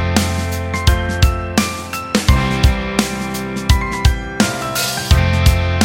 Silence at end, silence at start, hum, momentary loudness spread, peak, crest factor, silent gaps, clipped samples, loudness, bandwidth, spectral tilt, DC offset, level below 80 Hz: 0 s; 0 s; none; 6 LU; 0 dBFS; 16 dB; none; under 0.1%; -17 LUFS; 17 kHz; -4.5 dB/octave; under 0.1%; -20 dBFS